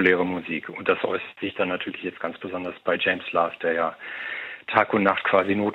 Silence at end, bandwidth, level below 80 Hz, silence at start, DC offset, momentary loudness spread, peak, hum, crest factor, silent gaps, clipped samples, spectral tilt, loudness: 0 s; 5.6 kHz; -68 dBFS; 0 s; under 0.1%; 11 LU; -2 dBFS; none; 24 dB; none; under 0.1%; -7.5 dB/octave; -25 LUFS